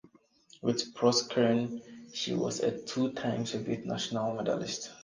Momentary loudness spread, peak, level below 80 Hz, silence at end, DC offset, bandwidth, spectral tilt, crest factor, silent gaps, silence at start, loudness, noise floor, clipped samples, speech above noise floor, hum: 9 LU; -12 dBFS; -70 dBFS; 0 s; under 0.1%; 10 kHz; -4.5 dB/octave; 20 dB; none; 0.65 s; -31 LUFS; -61 dBFS; under 0.1%; 30 dB; none